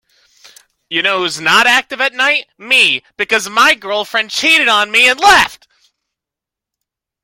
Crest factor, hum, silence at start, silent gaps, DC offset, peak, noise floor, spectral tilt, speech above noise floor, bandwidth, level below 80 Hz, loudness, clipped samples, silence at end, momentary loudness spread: 14 dB; none; 0.9 s; none; under 0.1%; 0 dBFS; -85 dBFS; -0.5 dB/octave; 72 dB; 17.5 kHz; -52 dBFS; -11 LUFS; under 0.1%; 1.7 s; 8 LU